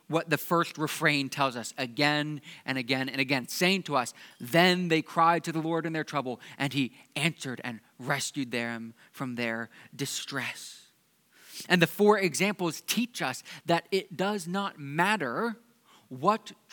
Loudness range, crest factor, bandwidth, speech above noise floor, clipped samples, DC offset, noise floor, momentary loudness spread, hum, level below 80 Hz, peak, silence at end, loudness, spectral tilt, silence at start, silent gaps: 7 LU; 26 dB; 19 kHz; 37 dB; under 0.1%; under 0.1%; -66 dBFS; 14 LU; none; -86 dBFS; -4 dBFS; 0.2 s; -29 LUFS; -4 dB/octave; 0.1 s; none